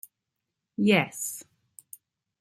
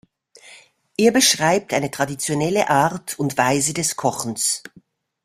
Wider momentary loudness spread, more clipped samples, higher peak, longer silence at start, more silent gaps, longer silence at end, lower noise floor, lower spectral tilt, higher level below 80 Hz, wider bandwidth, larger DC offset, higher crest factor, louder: first, 24 LU vs 9 LU; neither; second, -8 dBFS vs -2 dBFS; first, 0.8 s vs 0.45 s; neither; first, 1 s vs 0.65 s; first, -85 dBFS vs -54 dBFS; first, -4.5 dB/octave vs -3 dB/octave; second, -72 dBFS vs -60 dBFS; about the same, 16 kHz vs 16 kHz; neither; about the same, 22 dB vs 20 dB; second, -26 LUFS vs -19 LUFS